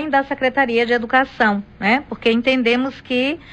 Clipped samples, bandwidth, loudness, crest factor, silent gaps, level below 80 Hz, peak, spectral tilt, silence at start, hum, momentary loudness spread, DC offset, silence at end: under 0.1%; 9 kHz; -18 LUFS; 14 dB; none; -50 dBFS; -4 dBFS; -5.5 dB/octave; 0 s; none; 4 LU; under 0.1%; 0 s